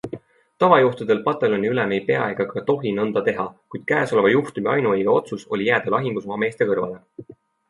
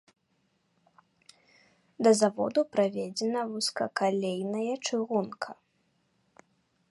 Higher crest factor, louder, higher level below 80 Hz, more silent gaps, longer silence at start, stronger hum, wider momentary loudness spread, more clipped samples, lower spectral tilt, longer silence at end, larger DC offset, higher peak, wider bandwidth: about the same, 20 dB vs 20 dB; first, -21 LUFS vs -29 LUFS; first, -62 dBFS vs -80 dBFS; neither; second, 0.05 s vs 2 s; neither; first, 11 LU vs 8 LU; neither; first, -7 dB/octave vs -4 dB/octave; second, 0.35 s vs 1.4 s; neither; first, 0 dBFS vs -10 dBFS; about the same, 11.5 kHz vs 11.5 kHz